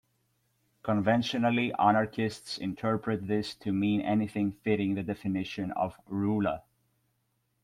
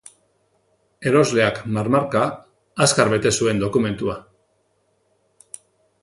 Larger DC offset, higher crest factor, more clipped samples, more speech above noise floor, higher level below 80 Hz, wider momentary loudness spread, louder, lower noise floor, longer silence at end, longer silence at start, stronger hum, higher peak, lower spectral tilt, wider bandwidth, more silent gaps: neither; about the same, 20 dB vs 22 dB; neither; about the same, 47 dB vs 47 dB; second, -64 dBFS vs -52 dBFS; second, 8 LU vs 23 LU; second, -30 LUFS vs -19 LUFS; first, -76 dBFS vs -66 dBFS; second, 1.05 s vs 1.85 s; second, 0.85 s vs 1 s; neither; second, -10 dBFS vs 0 dBFS; first, -6.5 dB/octave vs -4.5 dB/octave; about the same, 12.5 kHz vs 11.5 kHz; neither